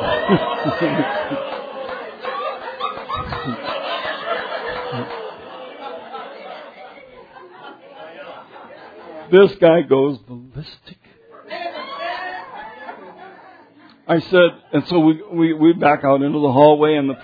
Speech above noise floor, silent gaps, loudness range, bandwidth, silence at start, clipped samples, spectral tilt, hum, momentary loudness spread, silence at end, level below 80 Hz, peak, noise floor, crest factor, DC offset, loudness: 32 dB; none; 16 LU; 5 kHz; 0 s; under 0.1%; -9 dB/octave; none; 24 LU; 0 s; -52 dBFS; 0 dBFS; -48 dBFS; 20 dB; under 0.1%; -18 LUFS